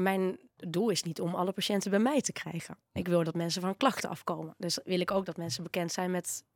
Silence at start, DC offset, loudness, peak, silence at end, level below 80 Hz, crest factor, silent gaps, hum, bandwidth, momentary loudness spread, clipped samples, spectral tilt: 0 s; under 0.1%; -32 LUFS; -12 dBFS; 0.15 s; -72 dBFS; 20 dB; none; none; 18 kHz; 9 LU; under 0.1%; -4.5 dB/octave